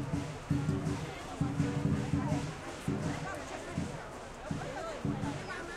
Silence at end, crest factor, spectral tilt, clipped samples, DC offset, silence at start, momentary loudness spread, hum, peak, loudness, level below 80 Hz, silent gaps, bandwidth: 0 s; 18 dB; -6.5 dB/octave; under 0.1%; under 0.1%; 0 s; 8 LU; none; -18 dBFS; -36 LUFS; -52 dBFS; none; 13 kHz